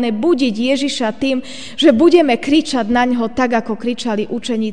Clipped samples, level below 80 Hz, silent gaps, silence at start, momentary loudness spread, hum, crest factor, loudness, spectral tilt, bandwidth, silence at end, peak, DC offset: under 0.1%; -48 dBFS; none; 0 s; 10 LU; none; 16 dB; -15 LUFS; -4.5 dB/octave; 10 kHz; 0 s; 0 dBFS; 2%